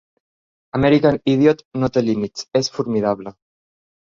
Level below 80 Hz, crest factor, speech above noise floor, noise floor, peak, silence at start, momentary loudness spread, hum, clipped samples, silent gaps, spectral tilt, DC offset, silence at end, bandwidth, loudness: -48 dBFS; 18 dB; over 72 dB; under -90 dBFS; -2 dBFS; 0.75 s; 9 LU; none; under 0.1%; 1.65-1.71 s; -6.5 dB/octave; under 0.1%; 0.85 s; 7.6 kHz; -19 LUFS